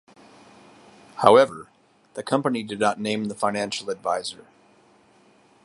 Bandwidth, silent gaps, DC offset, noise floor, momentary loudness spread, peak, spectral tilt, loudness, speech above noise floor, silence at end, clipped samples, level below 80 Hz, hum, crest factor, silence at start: 11.5 kHz; none; under 0.1%; -57 dBFS; 22 LU; 0 dBFS; -4.5 dB/octave; -23 LUFS; 35 dB; 1.3 s; under 0.1%; -68 dBFS; none; 24 dB; 1.15 s